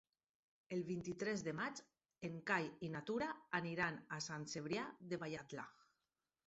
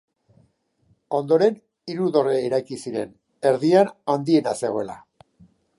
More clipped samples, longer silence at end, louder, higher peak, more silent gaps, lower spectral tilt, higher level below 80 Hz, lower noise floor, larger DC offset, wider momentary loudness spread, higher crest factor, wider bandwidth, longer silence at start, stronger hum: neither; about the same, 0.75 s vs 0.8 s; second, -45 LUFS vs -22 LUFS; second, -24 dBFS vs -4 dBFS; neither; second, -4 dB/octave vs -6.5 dB/octave; second, -78 dBFS vs -68 dBFS; first, under -90 dBFS vs -64 dBFS; neither; second, 10 LU vs 15 LU; about the same, 22 dB vs 18 dB; second, 8 kHz vs 11.5 kHz; second, 0.7 s vs 1.1 s; neither